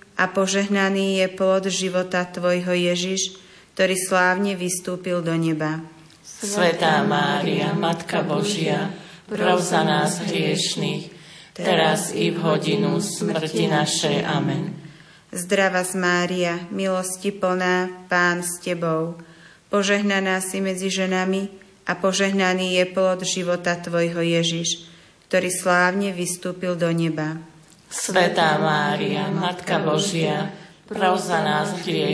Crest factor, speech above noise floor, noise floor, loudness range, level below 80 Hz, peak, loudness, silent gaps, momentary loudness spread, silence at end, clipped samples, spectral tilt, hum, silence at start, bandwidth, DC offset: 16 dB; 23 dB; -45 dBFS; 2 LU; -66 dBFS; -6 dBFS; -22 LUFS; none; 8 LU; 0 s; under 0.1%; -4 dB/octave; none; 0.15 s; 11 kHz; under 0.1%